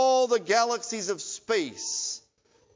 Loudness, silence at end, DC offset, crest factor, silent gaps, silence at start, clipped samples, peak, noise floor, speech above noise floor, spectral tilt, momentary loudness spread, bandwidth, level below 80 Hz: -27 LUFS; 0.55 s; under 0.1%; 18 dB; none; 0 s; under 0.1%; -8 dBFS; -65 dBFS; 37 dB; -1.5 dB/octave; 9 LU; 7.8 kHz; -76 dBFS